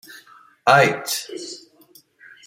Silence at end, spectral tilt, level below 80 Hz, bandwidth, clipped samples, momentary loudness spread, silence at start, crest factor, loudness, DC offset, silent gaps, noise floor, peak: 0.9 s; -3.5 dB/octave; -68 dBFS; 16.5 kHz; under 0.1%; 20 LU; 0.65 s; 22 dB; -18 LUFS; under 0.1%; none; -53 dBFS; -2 dBFS